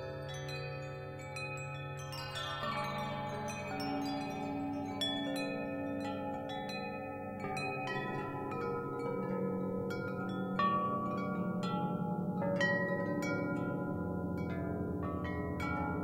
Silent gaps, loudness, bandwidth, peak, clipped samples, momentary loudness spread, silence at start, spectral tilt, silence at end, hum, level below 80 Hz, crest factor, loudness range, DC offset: none; -38 LUFS; 16 kHz; -20 dBFS; under 0.1%; 8 LU; 0 s; -6 dB/octave; 0 s; none; -60 dBFS; 18 dB; 4 LU; under 0.1%